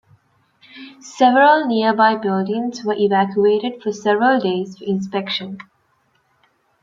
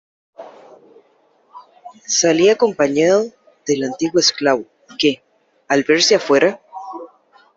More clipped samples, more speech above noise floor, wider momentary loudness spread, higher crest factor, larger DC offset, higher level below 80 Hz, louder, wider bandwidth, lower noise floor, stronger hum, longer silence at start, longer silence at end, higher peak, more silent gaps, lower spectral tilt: neither; first, 46 dB vs 42 dB; second, 13 LU vs 20 LU; about the same, 16 dB vs 16 dB; neither; second, -68 dBFS vs -62 dBFS; about the same, -17 LUFS vs -16 LUFS; about the same, 7.6 kHz vs 8 kHz; first, -63 dBFS vs -57 dBFS; neither; first, 0.75 s vs 0.4 s; first, 1.2 s vs 0.5 s; about the same, -2 dBFS vs -2 dBFS; neither; first, -5.5 dB/octave vs -3 dB/octave